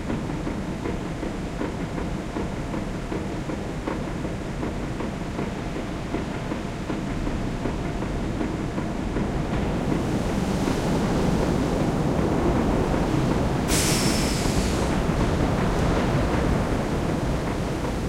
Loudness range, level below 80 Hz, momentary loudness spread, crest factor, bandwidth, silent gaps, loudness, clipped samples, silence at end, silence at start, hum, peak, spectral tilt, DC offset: 7 LU; -32 dBFS; 7 LU; 16 dB; 16 kHz; none; -26 LUFS; under 0.1%; 0 s; 0 s; none; -8 dBFS; -5.5 dB/octave; under 0.1%